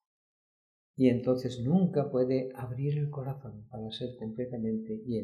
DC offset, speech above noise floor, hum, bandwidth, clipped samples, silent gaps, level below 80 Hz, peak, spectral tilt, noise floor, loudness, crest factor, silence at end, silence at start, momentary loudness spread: under 0.1%; over 59 dB; none; 13 kHz; under 0.1%; none; -66 dBFS; -12 dBFS; -9 dB/octave; under -90 dBFS; -31 LUFS; 20 dB; 0 s; 0.95 s; 13 LU